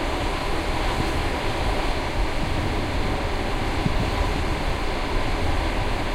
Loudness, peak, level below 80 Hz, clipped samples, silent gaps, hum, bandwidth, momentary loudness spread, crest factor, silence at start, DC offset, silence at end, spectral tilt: -26 LUFS; -6 dBFS; -26 dBFS; under 0.1%; none; none; 15.5 kHz; 2 LU; 16 dB; 0 s; under 0.1%; 0 s; -5.5 dB/octave